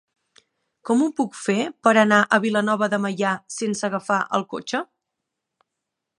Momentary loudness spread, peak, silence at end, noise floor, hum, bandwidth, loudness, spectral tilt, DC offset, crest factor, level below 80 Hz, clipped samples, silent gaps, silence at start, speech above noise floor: 11 LU; -2 dBFS; 1.35 s; -82 dBFS; none; 11 kHz; -21 LUFS; -4.5 dB/octave; under 0.1%; 20 dB; -74 dBFS; under 0.1%; none; 0.85 s; 61 dB